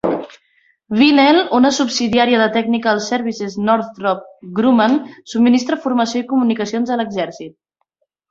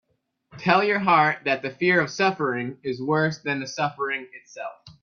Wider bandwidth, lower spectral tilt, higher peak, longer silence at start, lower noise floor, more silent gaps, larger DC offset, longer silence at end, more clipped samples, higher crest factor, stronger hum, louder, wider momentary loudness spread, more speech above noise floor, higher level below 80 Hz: about the same, 7.8 kHz vs 7.2 kHz; about the same, -4.5 dB/octave vs -5 dB/octave; first, 0 dBFS vs -4 dBFS; second, 0.05 s vs 0.55 s; first, -70 dBFS vs -65 dBFS; neither; neither; first, 0.8 s vs 0.1 s; neither; about the same, 16 dB vs 20 dB; neither; first, -16 LUFS vs -23 LUFS; second, 11 LU vs 16 LU; first, 54 dB vs 41 dB; first, -58 dBFS vs -68 dBFS